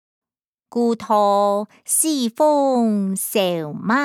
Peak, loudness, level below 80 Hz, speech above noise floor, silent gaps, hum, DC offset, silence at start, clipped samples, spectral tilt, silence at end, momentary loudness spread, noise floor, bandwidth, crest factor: -6 dBFS; -19 LUFS; -74 dBFS; 55 dB; none; none; under 0.1%; 0.75 s; under 0.1%; -4 dB/octave; 0 s; 6 LU; -74 dBFS; 19 kHz; 14 dB